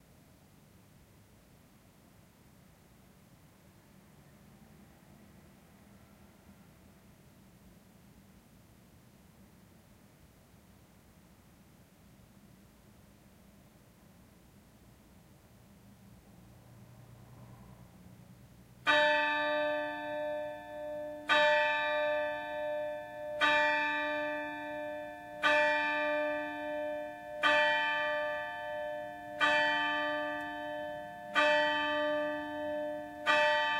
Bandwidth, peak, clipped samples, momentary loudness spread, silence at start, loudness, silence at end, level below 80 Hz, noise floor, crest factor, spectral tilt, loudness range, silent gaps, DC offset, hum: 16 kHz; -12 dBFS; under 0.1%; 15 LU; 4.5 s; -32 LUFS; 0 s; -68 dBFS; -61 dBFS; 24 dB; -3.5 dB/octave; 3 LU; none; under 0.1%; none